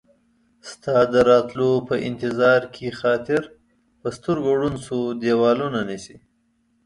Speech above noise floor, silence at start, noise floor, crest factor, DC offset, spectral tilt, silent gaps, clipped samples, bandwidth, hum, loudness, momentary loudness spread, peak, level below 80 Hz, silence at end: 45 dB; 0.65 s; -66 dBFS; 18 dB; under 0.1%; -6 dB/octave; none; under 0.1%; 11 kHz; none; -21 LUFS; 15 LU; -4 dBFS; -54 dBFS; 0.7 s